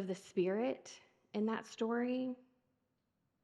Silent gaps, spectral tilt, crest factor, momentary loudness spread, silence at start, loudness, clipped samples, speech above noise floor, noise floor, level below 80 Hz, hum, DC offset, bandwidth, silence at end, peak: none; -6 dB/octave; 16 dB; 15 LU; 0 s; -39 LUFS; under 0.1%; 45 dB; -83 dBFS; under -90 dBFS; none; under 0.1%; 11.5 kHz; 1.1 s; -24 dBFS